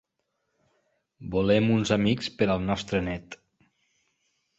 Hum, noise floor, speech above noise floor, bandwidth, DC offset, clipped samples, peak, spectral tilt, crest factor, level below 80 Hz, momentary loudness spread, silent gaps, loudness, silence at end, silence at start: none; -79 dBFS; 53 dB; 8.2 kHz; under 0.1%; under 0.1%; -8 dBFS; -6 dB/octave; 20 dB; -50 dBFS; 19 LU; none; -26 LUFS; 1.25 s; 1.2 s